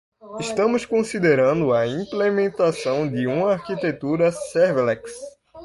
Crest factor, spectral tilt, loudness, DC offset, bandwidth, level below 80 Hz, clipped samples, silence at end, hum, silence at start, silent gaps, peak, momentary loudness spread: 16 dB; -6 dB/octave; -21 LUFS; under 0.1%; 11.5 kHz; -58 dBFS; under 0.1%; 0 s; none; 0.25 s; none; -6 dBFS; 10 LU